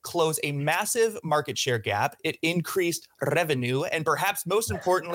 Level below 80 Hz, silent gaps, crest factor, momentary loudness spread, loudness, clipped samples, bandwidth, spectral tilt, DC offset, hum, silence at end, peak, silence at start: -62 dBFS; none; 14 dB; 3 LU; -26 LUFS; under 0.1%; 17 kHz; -4 dB/octave; under 0.1%; none; 0 s; -12 dBFS; 0.05 s